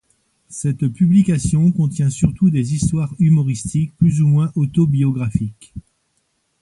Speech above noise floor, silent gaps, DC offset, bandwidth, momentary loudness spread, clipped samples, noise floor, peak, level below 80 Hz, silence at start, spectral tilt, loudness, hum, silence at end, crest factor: 51 dB; none; under 0.1%; 11.5 kHz; 9 LU; under 0.1%; -67 dBFS; 0 dBFS; -40 dBFS; 0.5 s; -7.5 dB/octave; -17 LUFS; none; 0.8 s; 16 dB